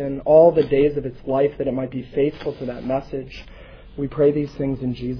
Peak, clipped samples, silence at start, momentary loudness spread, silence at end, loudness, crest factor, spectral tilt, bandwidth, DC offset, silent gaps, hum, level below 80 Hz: -2 dBFS; under 0.1%; 0 s; 17 LU; 0 s; -20 LUFS; 18 dB; -9.5 dB/octave; 5.4 kHz; under 0.1%; none; none; -44 dBFS